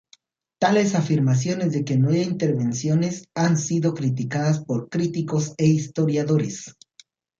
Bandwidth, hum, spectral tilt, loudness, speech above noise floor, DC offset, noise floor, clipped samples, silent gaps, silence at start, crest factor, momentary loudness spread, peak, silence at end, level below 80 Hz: 7.6 kHz; none; -6.5 dB/octave; -22 LUFS; 37 dB; under 0.1%; -58 dBFS; under 0.1%; none; 0.6 s; 16 dB; 5 LU; -6 dBFS; 0.7 s; -62 dBFS